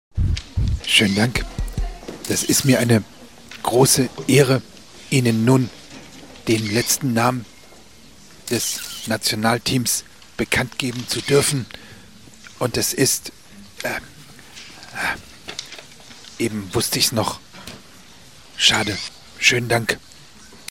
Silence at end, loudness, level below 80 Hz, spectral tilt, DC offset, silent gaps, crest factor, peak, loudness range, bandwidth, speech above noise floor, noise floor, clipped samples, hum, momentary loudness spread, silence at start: 0.15 s; -19 LUFS; -36 dBFS; -3.5 dB/octave; 0.4%; none; 20 dB; 0 dBFS; 6 LU; 16.5 kHz; 28 dB; -47 dBFS; under 0.1%; none; 22 LU; 0.15 s